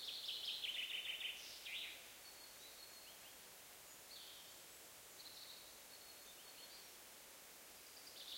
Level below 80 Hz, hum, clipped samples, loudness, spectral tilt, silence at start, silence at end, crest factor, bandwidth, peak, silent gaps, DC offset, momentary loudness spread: -84 dBFS; none; under 0.1%; -51 LUFS; 1 dB/octave; 0 s; 0 s; 20 dB; 16.5 kHz; -32 dBFS; none; under 0.1%; 14 LU